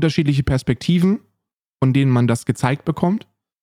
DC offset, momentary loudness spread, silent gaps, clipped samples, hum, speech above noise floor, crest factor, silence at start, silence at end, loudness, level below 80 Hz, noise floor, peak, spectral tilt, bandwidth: under 0.1%; 5 LU; 1.67-1.71 s; under 0.1%; none; 61 dB; 14 dB; 0 s; 0.45 s; -19 LUFS; -42 dBFS; -78 dBFS; -4 dBFS; -7 dB/octave; 13.5 kHz